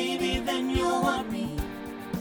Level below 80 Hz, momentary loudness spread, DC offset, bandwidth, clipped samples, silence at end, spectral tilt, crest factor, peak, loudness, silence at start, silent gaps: -42 dBFS; 10 LU; under 0.1%; over 20 kHz; under 0.1%; 0 s; -4.5 dB/octave; 16 dB; -12 dBFS; -29 LUFS; 0 s; none